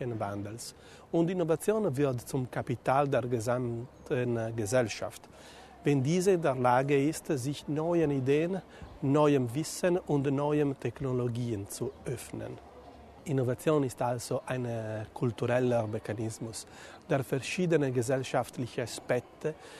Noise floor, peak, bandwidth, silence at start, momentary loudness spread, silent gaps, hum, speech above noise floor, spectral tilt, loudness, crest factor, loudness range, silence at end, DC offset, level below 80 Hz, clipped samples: -51 dBFS; -12 dBFS; 13.5 kHz; 0 s; 13 LU; none; none; 21 dB; -6.5 dB/octave; -31 LUFS; 18 dB; 5 LU; 0 s; under 0.1%; -60 dBFS; under 0.1%